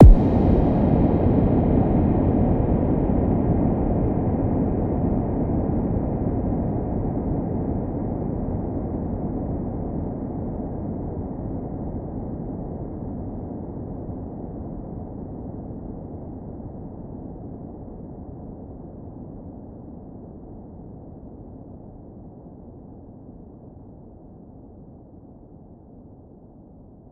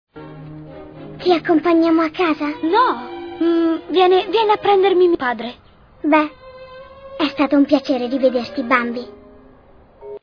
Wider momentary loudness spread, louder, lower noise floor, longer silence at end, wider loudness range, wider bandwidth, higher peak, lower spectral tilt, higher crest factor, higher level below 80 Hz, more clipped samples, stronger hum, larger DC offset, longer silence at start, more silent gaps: about the same, 24 LU vs 22 LU; second, -24 LUFS vs -17 LUFS; about the same, -46 dBFS vs -47 dBFS; about the same, 0.1 s vs 0.05 s; first, 23 LU vs 3 LU; second, 4 kHz vs 5.4 kHz; about the same, 0 dBFS vs 0 dBFS; first, -12.5 dB/octave vs -6 dB/octave; first, 24 dB vs 18 dB; first, -30 dBFS vs -54 dBFS; neither; neither; neither; second, 0 s vs 0.15 s; neither